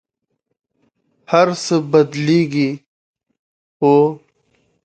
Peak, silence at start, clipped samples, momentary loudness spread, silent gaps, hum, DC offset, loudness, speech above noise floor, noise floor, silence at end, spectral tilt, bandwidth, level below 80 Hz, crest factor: 0 dBFS; 1.3 s; under 0.1%; 8 LU; 2.86-3.14 s, 3.39-3.80 s; none; under 0.1%; -16 LUFS; 59 dB; -73 dBFS; 0.7 s; -6 dB/octave; 9 kHz; -64 dBFS; 18 dB